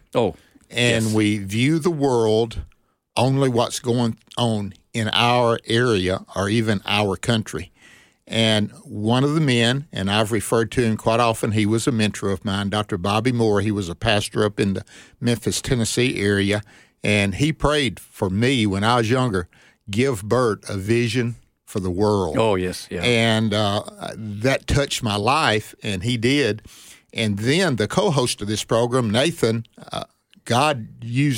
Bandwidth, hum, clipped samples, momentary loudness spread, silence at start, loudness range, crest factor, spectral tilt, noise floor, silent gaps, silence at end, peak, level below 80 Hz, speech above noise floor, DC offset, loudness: 16.5 kHz; none; under 0.1%; 9 LU; 0.15 s; 2 LU; 20 dB; -5 dB/octave; -51 dBFS; none; 0 s; -2 dBFS; -44 dBFS; 31 dB; under 0.1%; -21 LUFS